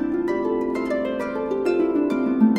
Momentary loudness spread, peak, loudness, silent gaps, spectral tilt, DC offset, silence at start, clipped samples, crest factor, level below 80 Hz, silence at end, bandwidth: 5 LU; -6 dBFS; -23 LUFS; none; -7.5 dB/octave; under 0.1%; 0 s; under 0.1%; 16 dB; -52 dBFS; 0 s; 9.8 kHz